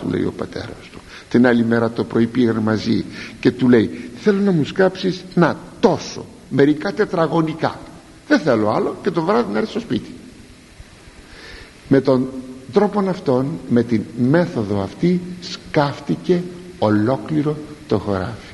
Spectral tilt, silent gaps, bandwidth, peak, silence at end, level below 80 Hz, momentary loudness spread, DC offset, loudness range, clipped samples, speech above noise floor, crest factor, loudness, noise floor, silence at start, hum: -7 dB/octave; none; 11.5 kHz; 0 dBFS; 0 s; -48 dBFS; 15 LU; under 0.1%; 4 LU; under 0.1%; 24 dB; 18 dB; -19 LUFS; -42 dBFS; 0 s; none